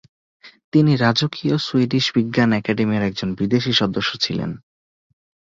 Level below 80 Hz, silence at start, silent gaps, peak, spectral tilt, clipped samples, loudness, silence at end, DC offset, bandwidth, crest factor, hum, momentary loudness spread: -54 dBFS; 0.45 s; 0.64-0.72 s; -4 dBFS; -6 dB/octave; under 0.1%; -19 LUFS; 1 s; under 0.1%; 7.6 kHz; 16 dB; none; 7 LU